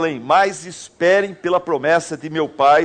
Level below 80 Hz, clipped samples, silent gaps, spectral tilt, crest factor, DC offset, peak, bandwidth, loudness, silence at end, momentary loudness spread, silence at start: -60 dBFS; under 0.1%; none; -4.5 dB/octave; 14 dB; under 0.1%; -4 dBFS; 9.4 kHz; -18 LUFS; 0 s; 9 LU; 0 s